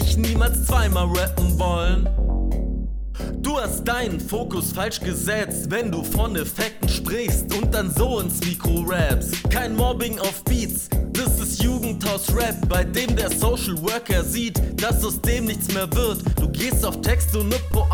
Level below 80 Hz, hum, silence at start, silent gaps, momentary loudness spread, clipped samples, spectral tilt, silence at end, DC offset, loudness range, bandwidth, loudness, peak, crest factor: -24 dBFS; none; 0 s; none; 4 LU; under 0.1%; -4.5 dB/octave; 0 s; under 0.1%; 2 LU; over 20 kHz; -22 LUFS; -6 dBFS; 14 dB